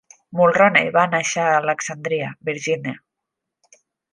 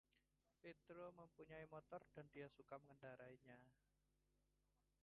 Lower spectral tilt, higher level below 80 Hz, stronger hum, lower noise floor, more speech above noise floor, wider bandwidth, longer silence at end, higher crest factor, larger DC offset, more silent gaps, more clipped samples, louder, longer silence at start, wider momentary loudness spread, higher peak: second, -4 dB/octave vs -5.5 dB/octave; first, -66 dBFS vs -86 dBFS; second, none vs 50 Hz at -80 dBFS; second, -82 dBFS vs -87 dBFS; first, 63 dB vs 25 dB; first, 10.5 kHz vs 4.3 kHz; second, 1.15 s vs 1.3 s; about the same, 20 dB vs 20 dB; neither; neither; neither; first, -19 LUFS vs -62 LUFS; first, 0.3 s vs 0.15 s; first, 12 LU vs 6 LU; first, -2 dBFS vs -42 dBFS